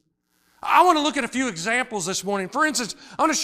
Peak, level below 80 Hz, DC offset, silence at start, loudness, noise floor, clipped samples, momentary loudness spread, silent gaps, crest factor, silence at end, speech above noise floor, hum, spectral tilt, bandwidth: -4 dBFS; -62 dBFS; under 0.1%; 0.65 s; -22 LUFS; -67 dBFS; under 0.1%; 9 LU; none; 20 dB; 0 s; 45 dB; none; -2.5 dB/octave; 15.5 kHz